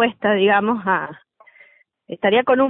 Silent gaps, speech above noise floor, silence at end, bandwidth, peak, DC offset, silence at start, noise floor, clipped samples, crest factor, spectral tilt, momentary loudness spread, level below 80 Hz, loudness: none; 35 dB; 0 s; 4 kHz; -4 dBFS; under 0.1%; 0 s; -53 dBFS; under 0.1%; 16 dB; -10 dB/octave; 12 LU; -62 dBFS; -18 LUFS